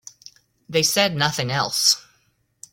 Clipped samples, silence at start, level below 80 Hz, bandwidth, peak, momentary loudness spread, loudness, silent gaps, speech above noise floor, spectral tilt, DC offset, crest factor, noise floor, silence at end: under 0.1%; 0.7 s; -60 dBFS; 16.5 kHz; -2 dBFS; 6 LU; -19 LUFS; none; 45 dB; -2 dB/octave; under 0.1%; 22 dB; -65 dBFS; 0.75 s